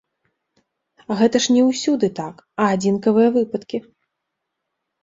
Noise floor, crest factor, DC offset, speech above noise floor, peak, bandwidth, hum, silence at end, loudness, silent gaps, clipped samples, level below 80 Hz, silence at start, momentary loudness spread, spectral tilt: -79 dBFS; 18 dB; under 0.1%; 61 dB; -4 dBFS; 7.8 kHz; none; 1.25 s; -18 LUFS; none; under 0.1%; -62 dBFS; 1.1 s; 14 LU; -5 dB/octave